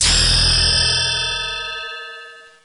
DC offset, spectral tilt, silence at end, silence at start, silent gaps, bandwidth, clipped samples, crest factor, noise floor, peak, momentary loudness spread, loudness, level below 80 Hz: under 0.1%; -1 dB/octave; 0.25 s; 0 s; none; 11 kHz; under 0.1%; 14 dB; -39 dBFS; -4 dBFS; 18 LU; -15 LUFS; -28 dBFS